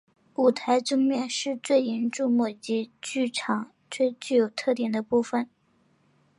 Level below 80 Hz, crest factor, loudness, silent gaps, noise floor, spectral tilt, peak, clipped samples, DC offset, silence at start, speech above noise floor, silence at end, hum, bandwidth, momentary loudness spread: -76 dBFS; 18 dB; -26 LUFS; none; -66 dBFS; -4 dB/octave; -10 dBFS; under 0.1%; under 0.1%; 0.4 s; 40 dB; 0.95 s; none; 11.5 kHz; 7 LU